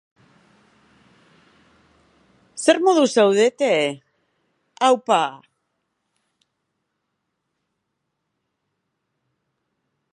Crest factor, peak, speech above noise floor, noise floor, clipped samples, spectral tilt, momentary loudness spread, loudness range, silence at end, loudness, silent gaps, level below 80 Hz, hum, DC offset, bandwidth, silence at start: 22 dB; -2 dBFS; 60 dB; -77 dBFS; under 0.1%; -3.5 dB/octave; 11 LU; 6 LU; 4.75 s; -18 LUFS; none; -78 dBFS; none; under 0.1%; 11.5 kHz; 2.55 s